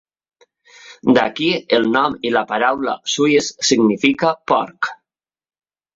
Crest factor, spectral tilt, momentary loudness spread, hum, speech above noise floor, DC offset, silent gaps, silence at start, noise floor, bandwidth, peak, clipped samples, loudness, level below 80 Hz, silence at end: 18 dB; -3.5 dB/octave; 6 LU; none; 66 dB; under 0.1%; none; 0.85 s; -83 dBFS; 7.8 kHz; 0 dBFS; under 0.1%; -17 LUFS; -58 dBFS; 1 s